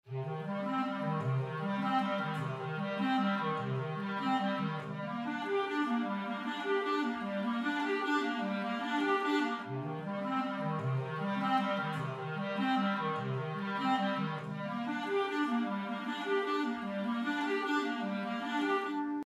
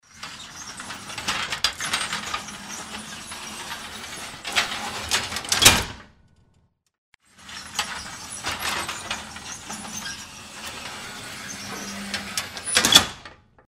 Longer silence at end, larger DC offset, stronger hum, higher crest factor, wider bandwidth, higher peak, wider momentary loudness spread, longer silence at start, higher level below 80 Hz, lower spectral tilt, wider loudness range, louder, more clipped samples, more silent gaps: second, 0.05 s vs 0.3 s; neither; neither; second, 16 dB vs 28 dB; second, 12.5 kHz vs 16 kHz; second, -18 dBFS vs 0 dBFS; second, 6 LU vs 20 LU; about the same, 0.05 s vs 0.1 s; second, -82 dBFS vs -50 dBFS; first, -6.5 dB/octave vs -0.5 dB/octave; second, 1 LU vs 10 LU; second, -34 LUFS vs -24 LUFS; neither; second, none vs 6.98-7.12 s